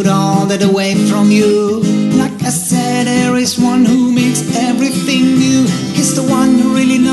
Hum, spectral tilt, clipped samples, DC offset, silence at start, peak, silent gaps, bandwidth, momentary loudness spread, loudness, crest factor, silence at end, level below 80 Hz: none; -5 dB/octave; under 0.1%; under 0.1%; 0 s; 0 dBFS; none; 12.5 kHz; 4 LU; -12 LUFS; 10 dB; 0 s; -48 dBFS